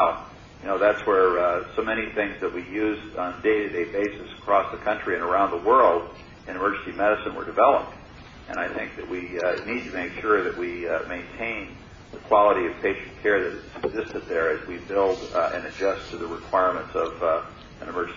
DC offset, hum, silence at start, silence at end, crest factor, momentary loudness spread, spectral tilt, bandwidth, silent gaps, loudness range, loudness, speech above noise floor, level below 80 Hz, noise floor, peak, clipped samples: under 0.1%; none; 0 s; 0 s; 20 dB; 14 LU; -6 dB/octave; 7.4 kHz; none; 4 LU; -25 LUFS; 20 dB; -52 dBFS; -44 dBFS; -6 dBFS; under 0.1%